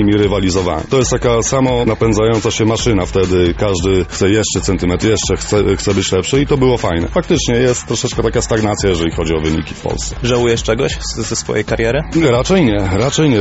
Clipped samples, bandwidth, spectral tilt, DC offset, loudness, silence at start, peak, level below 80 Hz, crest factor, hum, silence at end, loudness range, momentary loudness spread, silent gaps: under 0.1%; 8.2 kHz; -5 dB/octave; under 0.1%; -14 LUFS; 0 s; 0 dBFS; -28 dBFS; 12 dB; none; 0 s; 2 LU; 5 LU; none